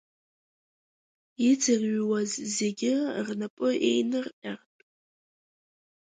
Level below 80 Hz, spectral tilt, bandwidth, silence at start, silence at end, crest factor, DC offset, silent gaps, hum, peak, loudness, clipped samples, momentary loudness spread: -76 dBFS; -4 dB/octave; 9.6 kHz; 1.4 s; 1.45 s; 16 dB; under 0.1%; 3.50-3.57 s, 4.33-4.42 s; none; -12 dBFS; -27 LUFS; under 0.1%; 12 LU